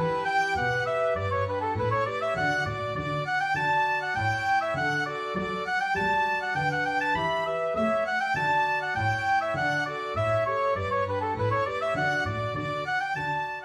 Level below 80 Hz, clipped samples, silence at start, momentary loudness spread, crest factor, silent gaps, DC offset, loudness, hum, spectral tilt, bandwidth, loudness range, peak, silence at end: -54 dBFS; under 0.1%; 0 s; 4 LU; 12 dB; none; under 0.1%; -27 LUFS; none; -5.5 dB/octave; 13.5 kHz; 1 LU; -14 dBFS; 0 s